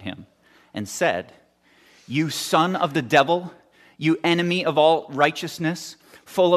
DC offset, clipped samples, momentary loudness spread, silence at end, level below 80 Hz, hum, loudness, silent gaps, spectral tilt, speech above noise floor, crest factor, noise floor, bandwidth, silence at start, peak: under 0.1%; under 0.1%; 17 LU; 0 s; -68 dBFS; none; -22 LUFS; none; -4.5 dB/octave; 36 dB; 20 dB; -57 dBFS; 14 kHz; 0 s; -4 dBFS